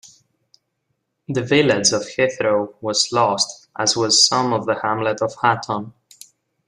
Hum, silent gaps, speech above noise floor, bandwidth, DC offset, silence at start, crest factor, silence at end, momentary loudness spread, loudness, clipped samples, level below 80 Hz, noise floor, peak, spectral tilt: none; none; 54 dB; 12.5 kHz; under 0.1%; 0.05 s; 18 dB; 0.8 s; 10 LU; -18 LUFS; under 0.1%; -62 dBFS; -73 dBFS; -2 dBFS; -2.5 dB/octave